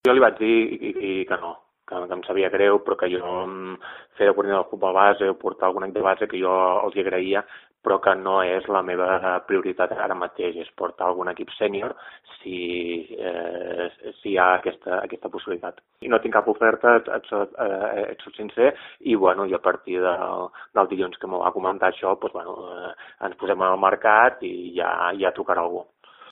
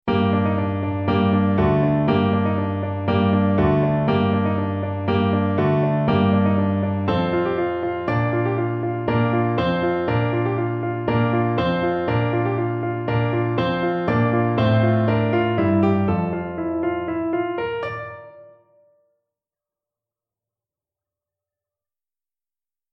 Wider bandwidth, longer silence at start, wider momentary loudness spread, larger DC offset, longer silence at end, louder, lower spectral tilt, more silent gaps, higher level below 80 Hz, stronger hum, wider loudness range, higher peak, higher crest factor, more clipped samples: second, 4.2 kHz vs 5.8 kHz; about the same, 0.05 s vs 0.05 s; first, 14 LU vs 6 LU; neither; second, 0 s vs 4.5 s; about the same, -23 LUFS vs -21 LUFS; second, -7 dB/octave vs -10 dB/octave; neither; second, -64 dBFS vs -46 dBFS; neither; second, 4 LU vs 7 LU; first, 0 dBFS vs -4 dBFS; first, 22 dB vs 16 dB; neither